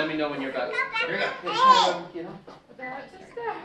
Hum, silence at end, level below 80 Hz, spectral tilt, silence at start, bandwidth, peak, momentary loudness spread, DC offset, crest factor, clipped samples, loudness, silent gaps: none; 0 s; -66 dBFS; -3 dB/octave; 0 s; 10 kHz; -6 dBFS; 22 LU; under 0.1%; 20 dB; under 0.1%; -24 LUFS; none